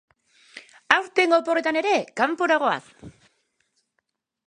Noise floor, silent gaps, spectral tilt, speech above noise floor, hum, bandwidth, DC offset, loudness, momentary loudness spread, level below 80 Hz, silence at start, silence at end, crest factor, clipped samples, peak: -77 dBFS; none; -3.5 dB/octave; 54 dB; none; 10.5 kHz; under 0.1%; -22 LUFS; 5 LU; -68 dBFS; 0.55 s; 1.4 s; 24 dB; under 0.1%; 0 dBFS